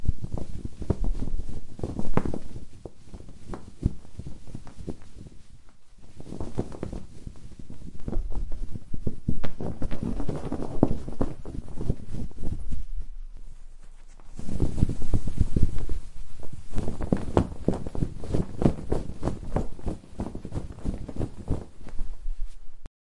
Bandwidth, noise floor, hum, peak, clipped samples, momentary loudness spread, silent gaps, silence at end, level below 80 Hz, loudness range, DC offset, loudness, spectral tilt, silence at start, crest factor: 10.5 kHz; -42 dBFS; none; 0 dBFS; under 0.1%; 19 LU; none; 0.15 s; -34 dBFS; 10 LU; under 0.1%; -33 LUFS; -8.5 dB/octave; 0 s; 22 dB